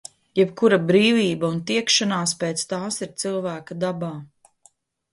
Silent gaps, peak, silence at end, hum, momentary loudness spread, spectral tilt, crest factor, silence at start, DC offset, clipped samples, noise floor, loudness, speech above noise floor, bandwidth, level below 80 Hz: none; -4 dBFS; 0.9 s; none; 11 LU; -4 dB/octave; 18 dB; 0.35 s; under 0.1%; under 0.1%; -59 dBFS; -21 LUFS; 38 dB; 11.5 kHz; -66 dBFS